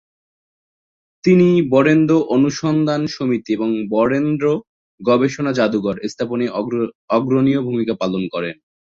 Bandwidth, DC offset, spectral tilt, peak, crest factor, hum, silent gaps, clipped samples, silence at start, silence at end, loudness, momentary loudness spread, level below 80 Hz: 7.6 kHz; under 0.1%; -7 dB/octave; -2 dBFS; 16 dB; none; 4.69-4.98 s, 6.95-7.08 s; under 0.1%; 1.25 s; 0.45 s; -18 LUFS; 10 LU; -56 dBFS